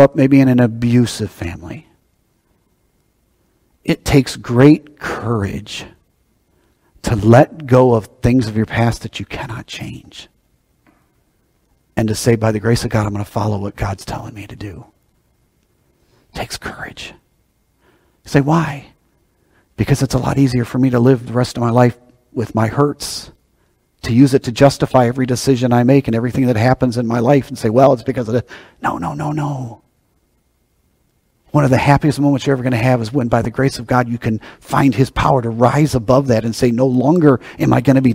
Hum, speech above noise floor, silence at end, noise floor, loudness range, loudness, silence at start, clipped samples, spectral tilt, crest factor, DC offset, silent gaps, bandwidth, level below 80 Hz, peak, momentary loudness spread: none; 47 dB; 0 s; -61 dBFS; 10 LU; -15 LUFS; 0 s; 0.1%; -7 dB/octave; 16 dB; under 0.1%; none; 16 kHz; -40 dBFS; 0 dBFS; 16 LU